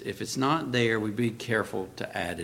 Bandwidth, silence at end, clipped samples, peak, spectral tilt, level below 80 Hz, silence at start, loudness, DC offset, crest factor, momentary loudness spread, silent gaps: 16.5 kHz; 0 s; under 0.1%; -10 dBFS; -5 dB/octave; -60 dBFS; 0 s; -29 LUFS; under 0.1%; 18 dB; 9 LU; none